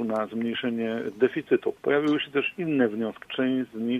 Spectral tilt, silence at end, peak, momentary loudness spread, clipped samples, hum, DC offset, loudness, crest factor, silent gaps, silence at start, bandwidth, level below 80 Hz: -7 dB/octave; 0 s; -10 dBFS; 5 LU; under 0.1%; none; under 0.1%; -27 LUFS; 18 dB; none; 0 s; 8 kHz; -70 dBFS